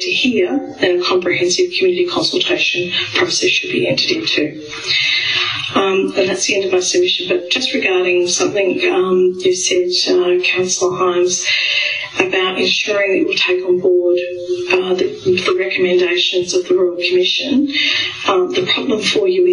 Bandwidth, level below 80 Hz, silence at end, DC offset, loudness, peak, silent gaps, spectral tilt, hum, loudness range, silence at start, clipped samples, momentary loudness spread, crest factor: 10.5 kHz; -58 dBFS; 0 s; under 0.1%; -14 LUFS; 0 dBFS; none; -2.5 dB/octave; none; 1 LU; 0 s; under 0.1%; 3 LU; 16 dB